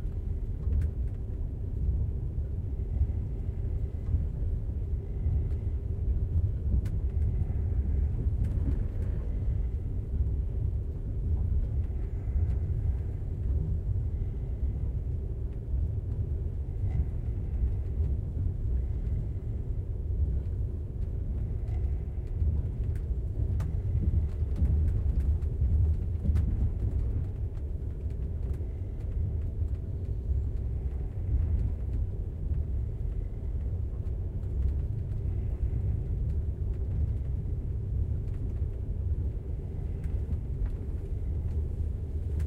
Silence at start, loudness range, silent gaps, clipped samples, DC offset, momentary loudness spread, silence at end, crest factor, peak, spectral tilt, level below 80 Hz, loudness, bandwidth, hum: 0 s; 4 LU; none; under 0.1%; under 0.1%; 5 LU; 0 s; 14 dB; -16 dBFS; -10.5 dB/octave; -32 dBFS; -33 LUFS; 2.7 kHz; none